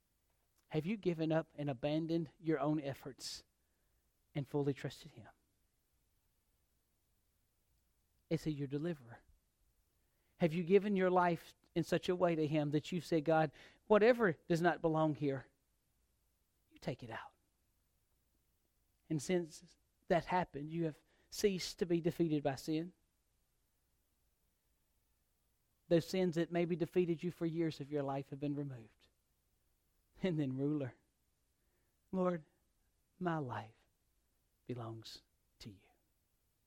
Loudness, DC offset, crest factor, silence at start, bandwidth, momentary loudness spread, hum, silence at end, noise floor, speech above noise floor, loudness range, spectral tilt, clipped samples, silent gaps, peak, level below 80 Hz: -38 LUFS; under 0.1%; 22 dB; 0.7 s; 16.5 kHz; 15 LU; none; 0.9 s; -81 dBFS; 44 dB; 12 LU; -6.5 dB/octave; under 0.1%; none; -18 dBFS; -70 dBFS